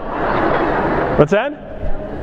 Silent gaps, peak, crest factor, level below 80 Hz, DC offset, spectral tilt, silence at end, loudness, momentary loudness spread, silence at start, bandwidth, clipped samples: none; 0 dBFS; 16 dB; -28 dBFS; under 0.1%; -7.5 dB/octave; 0 s; -17 LUFS; 13 LU; 0 s; 7.6 kHz; under 0.1%